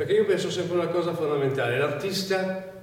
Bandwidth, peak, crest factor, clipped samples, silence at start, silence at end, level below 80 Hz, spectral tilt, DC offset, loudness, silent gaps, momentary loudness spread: 17 kHz; -12 dBFS; 14 dB; under 0.1%; 0 s; 0 s; -66 dBFS; -5 dB/octave; under 0.1%; -26 LUFS; none; 4 LU